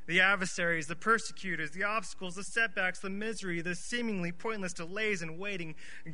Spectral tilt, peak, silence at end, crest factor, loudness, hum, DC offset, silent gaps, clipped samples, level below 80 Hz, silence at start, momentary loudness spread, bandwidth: -3.5 dB/octave; -12 dBFS; 0 s; 22 dB; -33 LUFS; none; 1%; none; under 0.1%; -62 dBFS; 0.1 s; 9 LU; 11 kHz